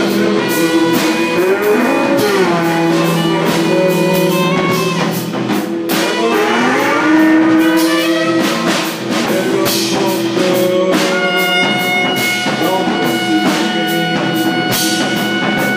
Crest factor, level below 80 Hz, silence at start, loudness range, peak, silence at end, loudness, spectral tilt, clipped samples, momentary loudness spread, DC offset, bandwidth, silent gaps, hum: 12 dB; -56 dBFS; 0 s; 2 LU; 0 dBFS; 0 s; -13 LUFS; -4.5 dB/octave; under 0.1%; 3 LU; under 0.1%; 16 kHz; none; none